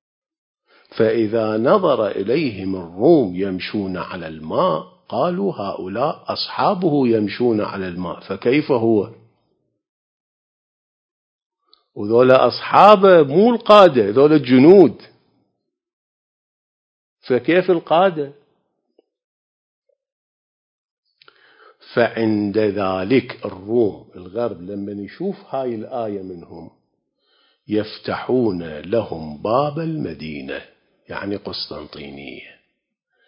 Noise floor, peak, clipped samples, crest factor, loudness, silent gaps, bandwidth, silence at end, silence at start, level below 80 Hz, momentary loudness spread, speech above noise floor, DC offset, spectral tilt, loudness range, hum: -73 dBFS; 0 dBFS; under 0.1%; 18 dB; -17 LUFS; 9.89-11.39 s, 11.46-11.50 s, 15.93-17.17 s, 19.24-19.82 s, 20.12-21.03 s; 8 kHz; 0.85 s; 0.95 s; -56 dBFS; 18 LU; 56 dB; under 0.1%; -8 dB/octave; 15 LU; none